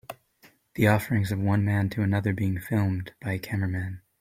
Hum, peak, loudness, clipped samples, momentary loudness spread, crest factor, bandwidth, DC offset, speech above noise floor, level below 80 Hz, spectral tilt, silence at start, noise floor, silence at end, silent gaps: none; -6 dBFS; -27 LUFS; under 0.1%; 12 LU; 20 dB; 16 kHz; under 0.1%; 34 dB; -56 dBFS; -7.5 dB/octave; 0.1 s; -60 dBFS; 0.25 s; none